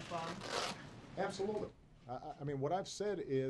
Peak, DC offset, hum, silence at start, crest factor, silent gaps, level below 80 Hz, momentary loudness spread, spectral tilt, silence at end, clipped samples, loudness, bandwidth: -22 dBFS; under 0.1%; none; 0 s; 18 dB; none; -66 dBFS; 11 LU; -5 dB/octave; 0 s; under 0.1%; -42 LUFS; 12 kHz